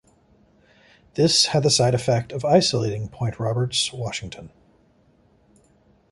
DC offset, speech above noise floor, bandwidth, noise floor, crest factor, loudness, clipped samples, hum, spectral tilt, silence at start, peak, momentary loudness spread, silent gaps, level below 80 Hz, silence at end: under 0.1%; 38 dB; 11.5 kHz; -59 dBFS; 20 dB; -21 LUFS; under 0.1%; none; -4 dB/octave; 1.15 s; -4 dBFS; 14 LU; none; -52 dBFS; 1.65 s